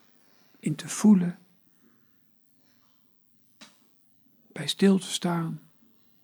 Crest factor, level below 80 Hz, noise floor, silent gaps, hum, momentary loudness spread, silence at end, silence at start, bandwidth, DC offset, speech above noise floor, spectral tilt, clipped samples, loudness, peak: 20 dB; -80 dBFS; -63 dBFS; none; none; 19 LU; 0.65 s; 0.65 s; over 20 kHz; under 0.1%; 39 dB; -5.5 dB/octave; under 0.1%; -25 LUFS; -10 dBFS